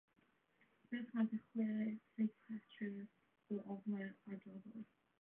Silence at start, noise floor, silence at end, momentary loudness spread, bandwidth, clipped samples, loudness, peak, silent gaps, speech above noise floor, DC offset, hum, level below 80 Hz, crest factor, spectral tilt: 0.9 s; -79 dBFS; 0.35 s; 14 LU; 3.6 kHz; under 0.1%; -46 LUFS; -30 dBFS; none; 34 dB; under 0.1%; none; under -90 dBFS; 16 dB; -7 dB/octave